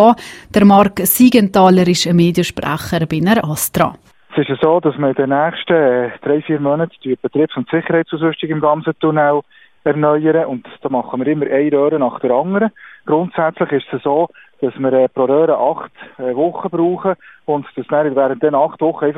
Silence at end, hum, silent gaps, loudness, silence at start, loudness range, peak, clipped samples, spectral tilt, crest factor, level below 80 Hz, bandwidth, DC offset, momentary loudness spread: 0 s; none; none; -15 LUFS; 0 s; 4 LU; 0 dBFS; under 0.1%; -6 dB/octave; 14 dB; -50 dBFS; 16 kHz; 0.1%; 10 LU